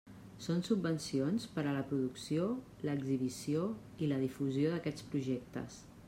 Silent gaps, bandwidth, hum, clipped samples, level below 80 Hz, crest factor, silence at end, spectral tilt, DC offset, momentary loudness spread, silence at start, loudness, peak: none; 16 kHz; none; under 0.1%; -68 dBFS; 16 dB; 0 s; -6.5 dB/octave; under 0.1%; 6 LU; 0.05 s; -37 LUFS; -20 dBFS